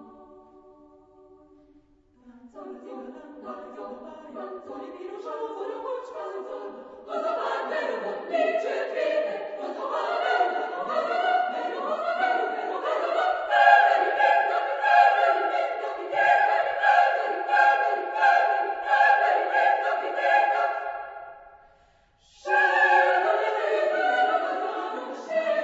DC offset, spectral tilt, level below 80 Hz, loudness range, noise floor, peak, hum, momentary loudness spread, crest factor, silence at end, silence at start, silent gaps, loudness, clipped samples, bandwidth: under 0.1%; -2.5 dB/octave; -74 dBFS; 17 LU; -61 dBFS; -4 dBFS; none; 20 LU; 22 dB; 0 s; 0 s; none; -23 LUFS; under 0.1%; 8 kHz